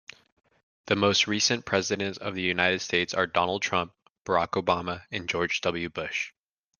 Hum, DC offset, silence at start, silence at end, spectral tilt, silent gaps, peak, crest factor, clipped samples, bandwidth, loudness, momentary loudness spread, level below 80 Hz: none; under 0.1%; 0.85 s; 0.5 s; -3 dB/octave; 4.10-4.25 s; -6 dBFS; 22 dB; under 0.1%; 11 kHz; -27 LUFS; 9 LU; -64 dBFS